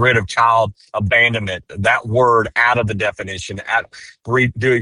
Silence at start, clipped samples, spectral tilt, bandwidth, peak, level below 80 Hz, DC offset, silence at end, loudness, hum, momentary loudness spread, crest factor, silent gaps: 0 s; under 0.1%; -5 dB/octave; 11 kHz; 0 dBFS; -46 dBFS; under 0.1%; 0 s; -16 LUFS; none; 12 LU; 16 dB; none